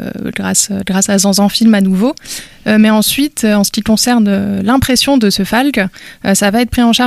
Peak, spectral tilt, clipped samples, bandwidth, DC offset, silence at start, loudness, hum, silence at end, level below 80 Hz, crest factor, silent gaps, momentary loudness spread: 0 dBFS; -4 dB/octave; under 0.1%; 15 kHz; under 0.1%; 0 s; -11 LUFS; none; 0 s; -36 dBFS; 12 dB; none; 8 LU